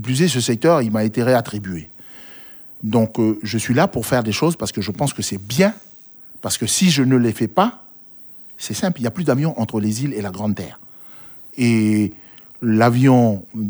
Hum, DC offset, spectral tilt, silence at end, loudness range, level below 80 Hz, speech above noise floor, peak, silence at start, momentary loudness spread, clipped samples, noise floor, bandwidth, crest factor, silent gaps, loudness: none; under 0.1%; -5.5 dB/octave; 0 s; 3 LU; -54 dBFS; 24 dB; -2 dBFS; 0 s; 21 LU; under 0.1%; -42 dBFS; over 20 kHz; 18 dB; none; -18 LUFS